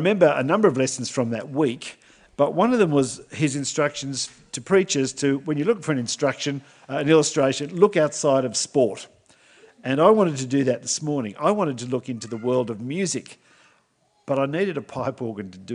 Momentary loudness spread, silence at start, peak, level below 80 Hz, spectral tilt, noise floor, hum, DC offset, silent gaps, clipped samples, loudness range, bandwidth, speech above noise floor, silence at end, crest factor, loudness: 11 LU; 0 s; -2 dBFS; -66 dBFS; -4.5 dB/octave; -65 dBFS; none; under 0.1%; none; under 0.1%; 6 LU; 10.5 kHz; 43 dB; 0 s; 20 dB; -22 LUFS